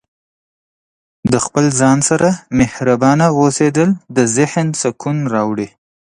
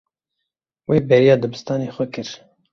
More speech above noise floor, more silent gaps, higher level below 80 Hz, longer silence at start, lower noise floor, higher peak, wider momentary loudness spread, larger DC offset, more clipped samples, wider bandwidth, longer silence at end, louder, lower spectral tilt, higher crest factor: first, over 76 dB vs 63 dB; neither; first, -44 dBFS vs -56 dBFS; first, 1.25 s vs 0.9 s; first, under -90 dBFS vs -80 dBFS; about the same, 0 dBFS vs -2 dBFS; second, 7 LU vs 20 LU; neither; neither; first, 11 kHz vs 7.2 kHz; about the same, 0.45 s vs 0.35 s; first, -14 LUFS vs -18 LUFS; second, -5.5 dB/octave vs -7 dB/octave; about the same, 14 dB vs 18 dB